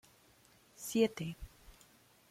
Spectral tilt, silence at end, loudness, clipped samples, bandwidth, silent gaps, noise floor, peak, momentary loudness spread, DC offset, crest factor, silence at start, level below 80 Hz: -5 dB/octave; 0.6 s; -36 LUFS; under 0.1%; 16.5 kHz; none; -66 dBFS; -18 dBFS; 20 LU; under 0.1%; 22 dB; 0.8 s; -62 dBFS